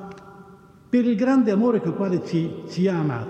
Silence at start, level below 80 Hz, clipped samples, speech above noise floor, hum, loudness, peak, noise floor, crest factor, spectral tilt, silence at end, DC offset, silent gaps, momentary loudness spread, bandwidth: 0 s; -62 dBFS; under 0.1%; 27 dB; none; -22 LUFS; -10 dBFS; -48 dBFS; 14 dB; -8 dB/octave; 0 s; under 0.1%; none; 7 LU; 8.2 kHz